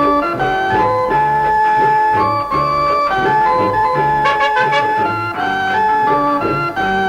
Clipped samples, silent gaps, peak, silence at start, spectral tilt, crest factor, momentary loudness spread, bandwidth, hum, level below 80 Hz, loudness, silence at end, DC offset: under 0.1%; none; -2 dBFS; 0 s; -6 dB/octave; 12 dB; 4 LU; 15.5 kHz; none; -42 dBFS; -14 LUFS; 0 s; under 0.1%